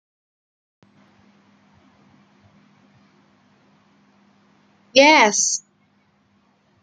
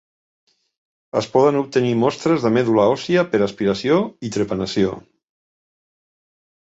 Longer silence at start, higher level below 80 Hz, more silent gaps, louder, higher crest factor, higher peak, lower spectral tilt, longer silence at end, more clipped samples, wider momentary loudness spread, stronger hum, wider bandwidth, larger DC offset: first, 4.95 s vs 1.15 s; second, -76 dBFS vs -54 dBFS; neither; first, -15 LUFS vs -19 LUFS; about the same, 22 dB vs 18 dB; about the same, -2 dBFS vs -2 dBFS; second, -1 dB/octave vs -6 dB/octave; second, 1.25 s vs 1.75 s; neither; about the same, 10 LU vs 8 LU; neither; first, 10 kHz vs 8 kHz; neither